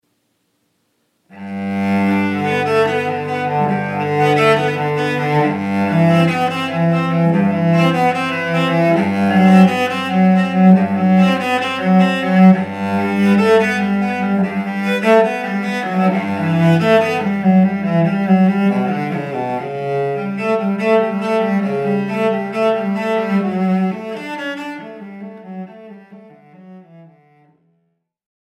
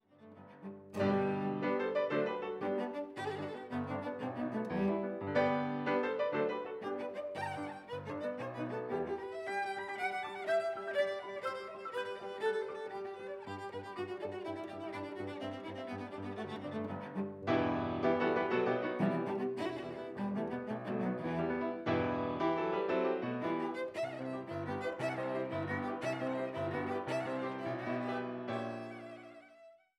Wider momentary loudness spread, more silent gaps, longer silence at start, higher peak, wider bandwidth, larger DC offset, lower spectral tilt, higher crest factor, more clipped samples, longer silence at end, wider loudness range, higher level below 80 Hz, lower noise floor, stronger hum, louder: about the same, 10 LU vs 10 LU; neither; first, 1.35 s vs 0.2 s; first, 0 dBFS vs -18 dBFS; about the same, 11.5 kHz vs 12 kHz; neither; about the same, -7.5 dB/octave vs -7 dB/octave; about the same, 16 dB vs 18 dB; neither; first, 1.4 s vs 0.25 s; about the same, 7 LU vs 6 LU; about the same, -68 dBFS vs -72 dBFS; first, -67 dBFS vs -61 dBFS; neither; first, -15 LUFS vs -37 LUFS